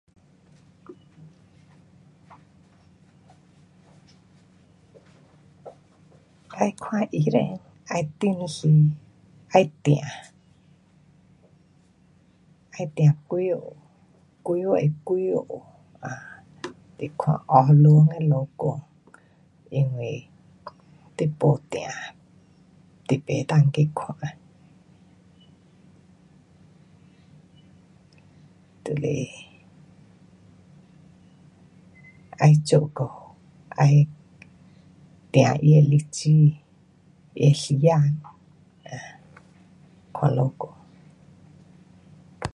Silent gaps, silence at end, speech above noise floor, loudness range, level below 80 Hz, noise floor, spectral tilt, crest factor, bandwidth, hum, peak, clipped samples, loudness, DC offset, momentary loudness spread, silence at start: none; 0.05 s; 38 dB; 14 LU; -62 dBFS; -58 dBFS; -7.5 dB/octave; 22 dB; 10.5 kHz; none; -2 dBFS; under 0.1%; -22 LUFS; under 0.1%; 22 LU; 0.9 s